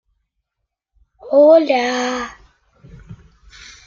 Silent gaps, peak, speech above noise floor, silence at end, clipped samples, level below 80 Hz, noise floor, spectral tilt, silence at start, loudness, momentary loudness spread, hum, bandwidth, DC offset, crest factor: none; -2 dBFS; 65 dB; 0.7 s; under 0.1%; -52 dBFS; -78 dBFS; -4 dB/octave; 1.25 s; -14 LUFS; 15 LU; none; 7.2 kHz; under 0.1%; 16 dB